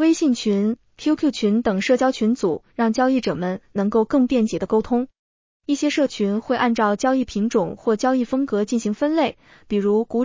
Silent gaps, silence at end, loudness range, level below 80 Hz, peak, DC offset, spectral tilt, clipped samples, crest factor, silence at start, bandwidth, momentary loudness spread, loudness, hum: 5.19-5.60 s; 0 s; 1 LU; -54 dBFS; -6 dBFS; under 0.1%; -5.5 dB/octave; under 0.1%; 14 dB; 0 s; 7.6 kHz; 6 LU; -21 LUFS; none